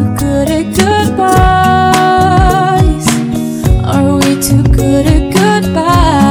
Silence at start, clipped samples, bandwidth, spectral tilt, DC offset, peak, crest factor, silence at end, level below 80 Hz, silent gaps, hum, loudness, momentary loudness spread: 0 s; 1%; over 20 kHz; -5.5 dB/octave; under 0.1%; 0 dBFS; 8 dB; 0 s; -18 dBFS; none; none; -9 LUFS; 4 LU